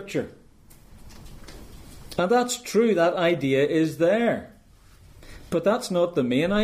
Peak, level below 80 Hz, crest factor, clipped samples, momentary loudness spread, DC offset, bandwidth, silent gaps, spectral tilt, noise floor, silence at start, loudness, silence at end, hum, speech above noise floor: -10 dBFS; -50 dBFS; 16 dB; under 0.1%; 12 LU; under 0.1%; 15.5 kHz; none; -5 dB/octave; -52 dBFS; 0 s; -23 LUFS; 0 s; none; 30 dB